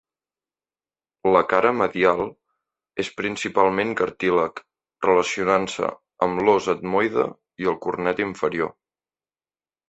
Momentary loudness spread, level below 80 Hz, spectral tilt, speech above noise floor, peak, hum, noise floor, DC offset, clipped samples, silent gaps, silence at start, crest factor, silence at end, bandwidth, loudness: 9 LU; -58 dBFS; -5 dB/octave; over 69 dB; -2 dBFS; none; under -90 dBFS; under 0.1%; under 0.1%; none; 1.25 s; 22 dB; 1.2 s; 8.4 kHz; -22 LUFS